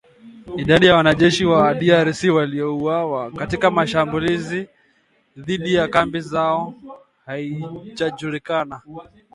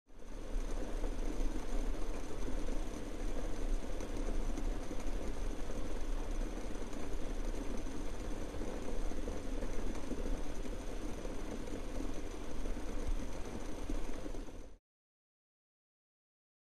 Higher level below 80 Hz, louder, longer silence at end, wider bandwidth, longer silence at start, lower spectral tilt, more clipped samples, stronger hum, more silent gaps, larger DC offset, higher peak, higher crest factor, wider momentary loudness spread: second, -48 dBFS vs -40 dBFS; first, -18 LUFS vs -44 LUFS; second, 0.3 s vs 1.95 s; about the same, 11.5 kHz vs 12.5 kHz; first, 0.25 s vs 0.05 s; about the same, -5.5 dB/octave vs -5.5 dB/octave; neither; neither; neither; second, under 0.1% vs 0.5%; first, 0 dBFS vs -22 dBFS; first, 20 dB vs 14 dB; first, 17 LU vs 3 LU